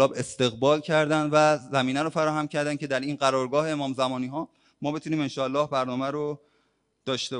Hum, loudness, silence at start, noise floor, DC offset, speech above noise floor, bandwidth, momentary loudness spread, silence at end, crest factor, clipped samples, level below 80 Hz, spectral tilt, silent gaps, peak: none; -26 LUFS; 0 s; -70 dBFS; under 0.1%; 45 dB; 11 kHz; 10 LU; 0 s; 18 dB; under 0.1%; -66 dBFS; -5 dB/octave; none; -6 dBFS